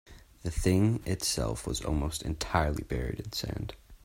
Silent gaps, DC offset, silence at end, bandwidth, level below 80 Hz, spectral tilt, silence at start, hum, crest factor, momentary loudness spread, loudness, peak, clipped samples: none; under 0.1%; 0.1 s; 16.5 kHz; -40 dBFS; -5 dB/octave; 0.05 s; none; 22 dB; 11 LU; -31 LUFS; -10 dBFS; under 0.1%